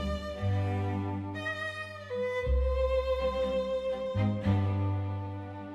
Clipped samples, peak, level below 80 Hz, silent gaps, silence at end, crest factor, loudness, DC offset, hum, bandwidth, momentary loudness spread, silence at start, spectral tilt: under 0.1%; -16 dBFS; -40 dBFS; none; 0 s; 14 dB; -32 LUFS; under 0.1%; none; 9.2 kHz; 7 LU; 0 s; -8 dB/octave